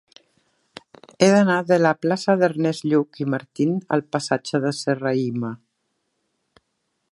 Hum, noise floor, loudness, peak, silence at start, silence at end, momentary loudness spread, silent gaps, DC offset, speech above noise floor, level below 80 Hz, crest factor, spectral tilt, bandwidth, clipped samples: none; -74 dBFS; -21 LUFS; 0 dBFS; 1.2 s; 1.55 s; 9 LU; none; under 0.1%; 54 dB; -68 dBFS; 22 dB; -6 dB/octave; 11.5 kHz; under 0.1%